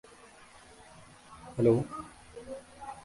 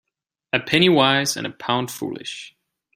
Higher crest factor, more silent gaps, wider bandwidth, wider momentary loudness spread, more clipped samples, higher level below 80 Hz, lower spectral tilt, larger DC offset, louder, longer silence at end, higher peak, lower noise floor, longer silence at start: about the same, 22 dB vs 20 dB; neither; second, 11.5 kHz vs 16 kHz; first, 27 LU vs 16 LU; neither; about the same, -62 dBFS vs -62 dBFS; first, -8 dB/octave vs -4 dB/octave; neither; second, -30 LUFS vs -20 LUFS; second, 0.05 s vs 0.45 s; second, -12 dBFS vs -2 dBFS; second, -55 dBFS vs -78 dBFS; first, 1 s vs 0.55 s